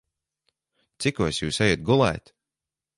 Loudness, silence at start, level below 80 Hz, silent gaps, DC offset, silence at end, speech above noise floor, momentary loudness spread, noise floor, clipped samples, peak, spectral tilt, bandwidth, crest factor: -23 LUFS; 1 s; -48 dBFS; none; under 0.1%; 0.8 s; 66 dB; 7 LU; -89 dBFS; under 0.1%; -6 dBFS; -5 dB/octave; 11.5 kHz; 20 dB